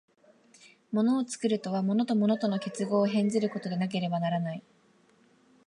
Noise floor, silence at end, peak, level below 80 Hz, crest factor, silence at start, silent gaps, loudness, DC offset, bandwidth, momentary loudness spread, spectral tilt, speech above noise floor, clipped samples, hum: -64 dBFS; 1.05 s; -14 dBFS; -80 dBFS; 16 dB; 0.9 s; none; -29 LUFS; under 0.1%; 11 kHz; 6 LU; -6.5 dB/octave; 36 dB; under 0.1%; none